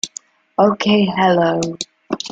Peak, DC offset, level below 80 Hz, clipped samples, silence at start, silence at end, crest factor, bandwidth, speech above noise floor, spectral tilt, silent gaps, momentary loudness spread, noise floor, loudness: -2 dBFS; under 0.1%; -56 dBFS; under 0.1%; 0.05 s; 0 s; 16 dB; 9.2 kHz; 24 dB; -4.5 dB/octave; none; 13 LU; -39 dBFS; -17 LUFS